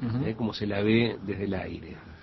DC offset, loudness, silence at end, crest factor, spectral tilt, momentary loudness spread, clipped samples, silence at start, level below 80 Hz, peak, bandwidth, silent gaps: under 0.1%; -29 LUFS; 0 s; 18 dB; -8 dB/octave; 14 LU; under 0.1%; 0 s; -50 dBFS; -10 dBFS; 6 kHz; none